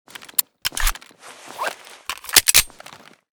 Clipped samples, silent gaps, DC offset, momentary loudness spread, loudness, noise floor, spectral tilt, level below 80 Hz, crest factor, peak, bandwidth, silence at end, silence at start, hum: under 0.1%; none; under 0.1%; 21 LU; -18 LUFS; -44 dBFS; 1 dB/octave; -34 dBFS; 24 dB; 0 dBFS; over 20 kHz; 0.7 s; 0.2 s; none